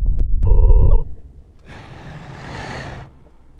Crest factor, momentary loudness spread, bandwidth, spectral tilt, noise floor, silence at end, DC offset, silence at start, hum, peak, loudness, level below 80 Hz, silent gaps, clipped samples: 14 dB; 23 LU; 4.9 kHz; -8 dB/octave; -45 dBFS; 0.55 s; under 0.1%; 0 s; none; -2 dBFS; -20 LUFS; -18 dBFS; none; under 0.1%